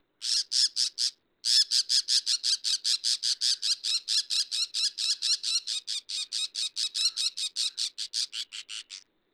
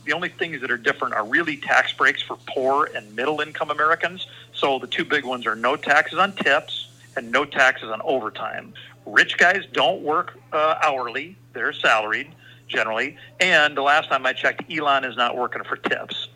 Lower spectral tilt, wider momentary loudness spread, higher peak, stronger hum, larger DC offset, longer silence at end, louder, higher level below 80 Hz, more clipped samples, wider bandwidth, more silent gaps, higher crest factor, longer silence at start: second, 7 dB/octave vs -3 dB/octave; about the same, 9 LU vs 11 LU; second, -12 dBFS vs 0 dBFS; neither; neither; first, 0.35 s vs 0.1 s; second, -26 LUFS vs -21 LUFS; second, -88 dBFS vs -70 dBFS; neither; first, over 20 kHz vs 15.5 kHz; neither; about the same, 18 dB vs 22 dB; first, 0.2 s vs 0.05 s